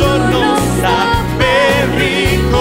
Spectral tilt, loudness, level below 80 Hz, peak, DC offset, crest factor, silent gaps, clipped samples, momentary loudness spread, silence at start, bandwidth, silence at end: -5 dB/octave; -12 LUFS; -24 dBFS; 0 dBFS; 0.6%; 12 dB; none; under 0.1%; 2 LU; 0 s; 16.5 kHz; 0 s